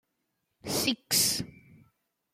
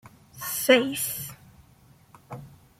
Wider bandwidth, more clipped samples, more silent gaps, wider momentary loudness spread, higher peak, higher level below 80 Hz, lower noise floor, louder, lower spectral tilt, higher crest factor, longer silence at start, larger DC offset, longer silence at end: about the same, 16.5 kHz vs 16.5 kHz; neither; neither; second, 18 LU vs 23 LU; second, -12 dBFS vs -6 dBFS; about the same, -64 dBFS vs -64 dBFS; first, -80 dBFS vs -56 dBFS; second, -27 LUFS vs -24 LUFS; about the same, -1.5 dB/octave vs -2.5 dB/octave; about the same, 22 dB vs 22 dB; first, 0.65 s vs 0.35 s; neither; first, 0.85 s vs 0.3 s